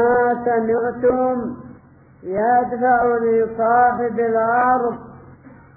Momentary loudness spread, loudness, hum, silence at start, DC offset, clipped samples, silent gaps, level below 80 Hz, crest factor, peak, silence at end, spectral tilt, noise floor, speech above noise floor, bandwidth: 10 LU; -18 LUFS; none; 0 s; under 0.1%; under 0.1%; none; -52 dBFS; 14 dB; -6 dBFS; 0.3 s; -12 dB/octave; -47 dBFS; 29 dB; 2.6 kHz